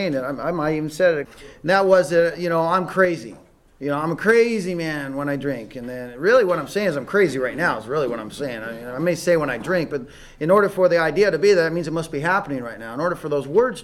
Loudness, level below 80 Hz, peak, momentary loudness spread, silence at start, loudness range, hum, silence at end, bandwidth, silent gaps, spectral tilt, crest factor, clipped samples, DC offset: -21 LUFS; -52 dBFS; -4 dBFS; 13 LU; 0 s; 3 LU; none; 0 s; 13.5 kHz; none; -5.5 dB/octave; 16 dB; under 0.1%; under 0.1%